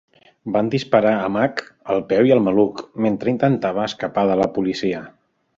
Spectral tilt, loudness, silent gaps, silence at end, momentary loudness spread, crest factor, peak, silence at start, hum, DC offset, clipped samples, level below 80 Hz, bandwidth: -7 dB/octave; -19 LUFS; none; 0.5 s; 8 LU; 18 dB; -2 dBFS; 0.45 s; none; under 0.1%; under 0.1%; -56 dBFS; 7.6 kHz